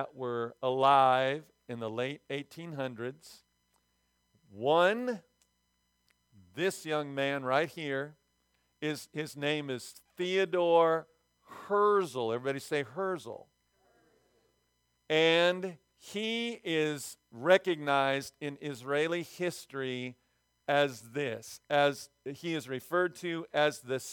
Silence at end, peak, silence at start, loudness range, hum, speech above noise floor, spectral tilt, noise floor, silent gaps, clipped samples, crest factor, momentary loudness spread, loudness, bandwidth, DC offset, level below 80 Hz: 0 s; -10 dBFS; 0 s; 5 LU; 60 Hz at -70 dBFS; 45 dB; -4.5 dB/octave; -77 dBFS; none; under 0.1%; 22 dB; 15 LU; -31 LUFS; 19 kHz; under 0.1%; -80 dBFS